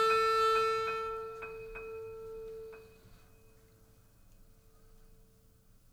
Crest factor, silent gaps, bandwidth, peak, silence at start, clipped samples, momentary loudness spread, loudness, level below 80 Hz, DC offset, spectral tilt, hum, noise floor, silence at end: 18 dB; none; 19 kHz; -18 dBFS; 0 s; under 0.1%; 20 LU; -33 LUFS; -60 dBFS; under 0.1%; -2.5 dB/octave; none; -63 dBFS; 0.8 s